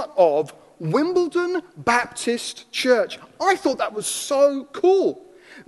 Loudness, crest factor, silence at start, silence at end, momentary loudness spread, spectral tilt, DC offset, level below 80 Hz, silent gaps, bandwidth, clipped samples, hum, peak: -21 LUFS; 18 dB; 0 s; 0.05 s; 9 LU; -4 dB/octave; under 0.1%; -64 dBFS; none; 12.5 kHz; under 0.1%; none; -4 dBFS